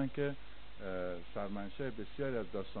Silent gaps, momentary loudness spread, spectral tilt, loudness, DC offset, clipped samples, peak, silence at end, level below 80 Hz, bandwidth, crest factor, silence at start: none; 8 LU; -5.5 dB/octave; -42 LUFS; 0.8%; under 0.1%; -24 dBFS; 0 s; -58 dBFS; 4.5 kHz; 16 dB; 0 s